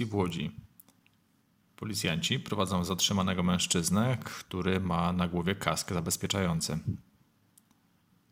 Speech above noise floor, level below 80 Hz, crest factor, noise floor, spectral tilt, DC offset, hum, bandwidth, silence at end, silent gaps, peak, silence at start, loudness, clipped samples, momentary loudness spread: 39 dB; -60 dBFS; 24 dB; -69 dBFS; -4 dB/octave; under 0.1%; none; 16 kHz; 1.3 s; none; -8 dBFS; 0 s; -30 LUFS; under 0.1%; 9 LU